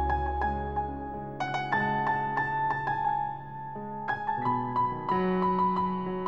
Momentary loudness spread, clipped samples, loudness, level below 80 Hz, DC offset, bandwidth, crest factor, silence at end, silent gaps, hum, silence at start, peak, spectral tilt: 10 LU; under 0.1%; -30 LUFS; -44 dBFS; 0.3%; 7.4 kHz; 16 dB; 0 s; none; none; 0 s; -14 dBFS; -7.5 dB/octave